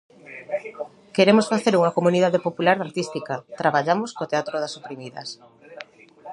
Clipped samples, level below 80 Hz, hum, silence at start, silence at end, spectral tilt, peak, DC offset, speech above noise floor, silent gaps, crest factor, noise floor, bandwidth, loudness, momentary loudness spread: under 0.1%; -72 dBFS; none; 0.25 s; 0 s; -5.5 dB/octave; -2 dBFS; under 0.1%; 21 dB; none; 22 dB; -43 dBFS; 11 kHz; -22 LUFS; 22 LU